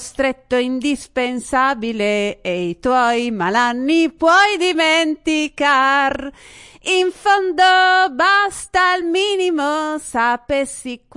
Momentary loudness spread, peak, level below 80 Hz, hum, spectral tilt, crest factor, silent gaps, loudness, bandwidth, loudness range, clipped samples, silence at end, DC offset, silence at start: 9 LU; -4 dBFS; -48 dBFS; none; -3 dB/octave; 14 dB; none; -16 LUFS; 11.5 kHz; 3 LU; under 0.1%; 0.2 s; under 0.1%; 0 s